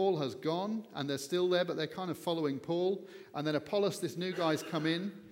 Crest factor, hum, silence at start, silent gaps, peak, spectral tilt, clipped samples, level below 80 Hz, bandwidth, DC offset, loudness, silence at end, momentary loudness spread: 16 dB; none; 0 s; none; -18 dBFS; -5.5 dB/octave; under 0.1%; -80 dBFS; 16.5 kHz; under 0.1%; -34 LUFS; 0 s; 6 LU